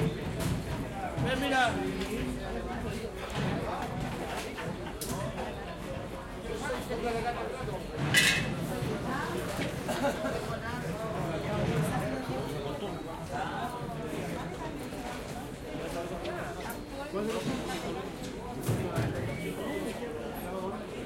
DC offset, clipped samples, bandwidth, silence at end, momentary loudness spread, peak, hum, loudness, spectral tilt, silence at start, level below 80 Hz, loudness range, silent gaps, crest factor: under 0.1%; under 0.1%; 16.5 kHz; 0 s; 8 LU; -10 dBFS; none; -34 LUFS; -4.5 dB/octave; 0 s; -48 dBFS; 7 LU; none; 24 dB